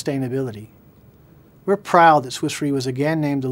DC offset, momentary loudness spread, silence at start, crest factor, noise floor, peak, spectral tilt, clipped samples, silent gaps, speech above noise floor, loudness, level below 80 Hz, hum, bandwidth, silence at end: under 0.1%; 15 LU; 0 s; 20 dB; -49 dBFS; 0 dBFS; -5.5 dB/octave; under 0.1%; none; 30 dB; -19 LUFS; -60 dBFS; none; 16 kHz; 0 s